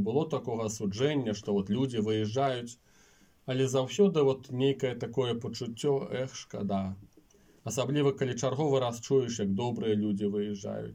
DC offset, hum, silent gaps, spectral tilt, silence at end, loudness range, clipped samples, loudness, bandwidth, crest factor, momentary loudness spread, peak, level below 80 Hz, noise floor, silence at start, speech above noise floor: under 0.1%; none; none; -6 dB/octave; 0 s; 3 LU; under 0.1%; -31 LUFS; 16 kHz; 18 dB; 8 LU; -14 dBFS; -68 dBFS; -62 dBFS; 0 s; 32 dB